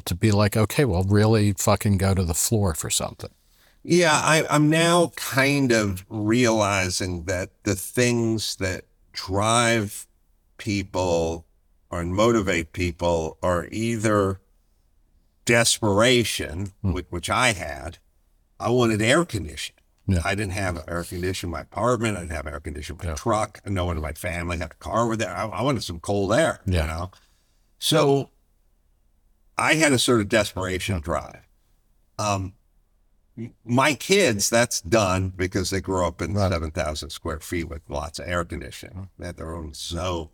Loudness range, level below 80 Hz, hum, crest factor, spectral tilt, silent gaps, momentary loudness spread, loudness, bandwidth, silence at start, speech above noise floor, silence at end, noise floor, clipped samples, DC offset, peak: 6 LU; -44 dBFS; none; 20 dB; -4.5 dB/octave; none; 15 LU; -23 LUFS; 19.5 kHz; 0.05 s; 40 dB; 0.05 s; -63 dBFS; under 0.1%; under 0.1%; -4 dBFS